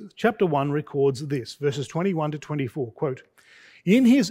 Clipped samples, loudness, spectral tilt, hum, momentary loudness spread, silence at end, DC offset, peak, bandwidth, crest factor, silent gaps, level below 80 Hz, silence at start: under 0.1%; -24 LUFS; -6.5 dB/octave; none; 11 LU; 0 s; under 0.1%; -6 dBFS; 16 kHz; 18 dB; none; -66 dBFS; 0 s